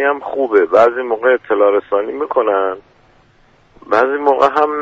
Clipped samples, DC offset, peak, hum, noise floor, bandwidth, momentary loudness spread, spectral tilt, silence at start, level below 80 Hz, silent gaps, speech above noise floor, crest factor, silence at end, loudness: under 0.1%; under 0.1%; 0 dBFS; none; -51 dBFS; 7.4 kHz; 7 LU; -5.5 dB/octave; 0 s; -56 dBFS; none; 37 dB; 14 dB; 0 s; -14 LUFS